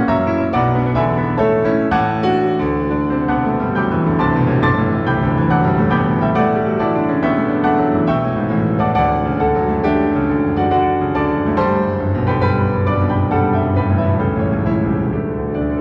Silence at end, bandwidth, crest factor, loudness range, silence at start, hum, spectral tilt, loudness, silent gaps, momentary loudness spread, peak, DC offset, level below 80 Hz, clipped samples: 0 s; 6 kHz; 12 dB; 1 LU; 0 s; none; -10 dB/octave; -17 LUFS; none; 3 LU; -4 dBFS; under 0.1%; -36 dBFS; under 0.1%